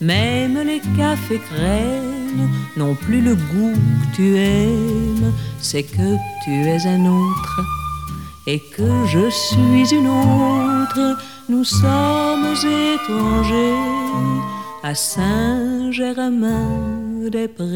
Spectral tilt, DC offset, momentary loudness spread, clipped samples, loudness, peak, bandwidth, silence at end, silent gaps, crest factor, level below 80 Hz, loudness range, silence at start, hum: -5.5 dB/octave; 0.4%; 8 LU; under 0.1%; -18 LUFS; -2 dBFS; 19 kHz; 0 s; none; 14 dB; -36 dBFS; 4 LU; 0 s; none